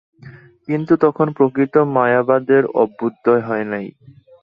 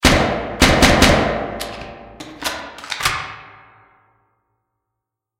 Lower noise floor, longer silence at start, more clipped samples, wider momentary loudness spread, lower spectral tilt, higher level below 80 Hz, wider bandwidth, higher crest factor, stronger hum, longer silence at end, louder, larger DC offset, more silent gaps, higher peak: second, -41 dBFS vs -81 dBFS; first, 0.25 s vs 0 s; neither; second, 10 LU vs 24 LU; first, -10.5 dB/octave vs -4 dB/octave; second, -62 dBFS vs -28 dBFS; second, 5.2 kHz vs 17 kHz; about the same, 16 dB vs 20 dB; neither; second, 0.5 s vs 1.95 s; about the same, -17 LUFS vs -16 LUFS; neither; neither; about the same, -2 dBFS vs 0 dBFS